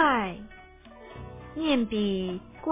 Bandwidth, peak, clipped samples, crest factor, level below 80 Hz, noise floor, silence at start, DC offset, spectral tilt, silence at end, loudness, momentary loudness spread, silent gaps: 3.8 kHz; -12 dBFS; under 0.1%; 16 dB; -52 dBFS; -49 dBFS; 0 s; under 0.1%; -3.5 dB/octave; 0 s; -28 LUFS; 22 LU; none